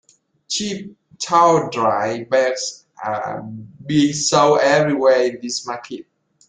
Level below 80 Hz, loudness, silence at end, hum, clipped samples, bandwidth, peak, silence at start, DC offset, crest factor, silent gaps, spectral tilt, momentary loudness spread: -60 dBFS; -18 LUFS; 0.5 s; none; under 0.1%; 9.6 kHz; -2 dBFS; 0.5 s; under 0.1%; 18 dB; none; -4 dB/octave; 16 LU